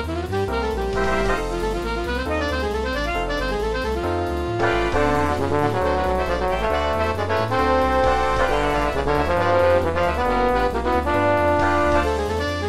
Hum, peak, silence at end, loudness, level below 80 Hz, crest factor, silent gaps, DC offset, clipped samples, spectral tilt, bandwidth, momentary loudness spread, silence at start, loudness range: none; -6 dBFS; 0 s; -21 LUFS; -30 dBFS; 14 dB; none; 2%; under 0.1%; -6 dB/octave; 15.5 kHz; 5 LU; 0 s; 4 LU